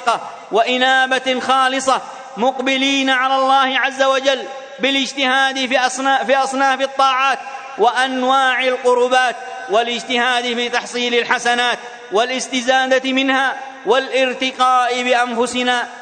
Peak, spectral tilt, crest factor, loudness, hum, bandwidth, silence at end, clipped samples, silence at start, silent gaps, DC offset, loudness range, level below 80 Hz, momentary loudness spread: 0 dBFS; -1.5 dB/octave; 16 dB; -16 LUFS; none; 9.4 kHz; 0 s; under 0.1%; 0 s; none; under 0.1%; 1 LU; -68 dBFS; 6 LU